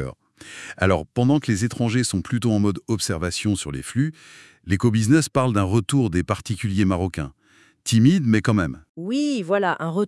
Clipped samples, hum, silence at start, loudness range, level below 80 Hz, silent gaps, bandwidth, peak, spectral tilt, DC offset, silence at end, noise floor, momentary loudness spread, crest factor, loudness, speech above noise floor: under 0.1%; none; 0 s; 2 LU; -50 dBFS; 8.89-8.95 s; 12 kHz; -4 dBFS; -6 dB/octave; under 0.1%; 0 s; -57 dBFS; 11 LU; 18 dB; -22 LUFS; 36 dB